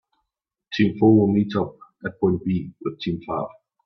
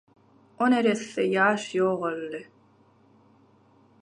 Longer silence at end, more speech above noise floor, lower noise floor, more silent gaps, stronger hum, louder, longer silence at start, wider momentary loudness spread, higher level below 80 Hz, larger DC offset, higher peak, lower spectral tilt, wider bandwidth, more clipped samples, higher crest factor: second, 0.35 s vs 1.6 s; first, 62 dB vs 35 dB; first, -82 dBFS vs -60 dBFS; neither; neither; first, -22 LUFS vs -25 LUFS; about the same, 0.7 s vs 0.6 s; first, 15 LU vs 12 LU; first, -56 dBFS vs -78 dBFS; neither; first, -4 dBFS vs -8 dBFS; first, -8.5 dB/octave vs -5 dB/octave; second, 6.2 kHz vs 10.5 kHz; neither; about the same, 18 dB vs 20 dB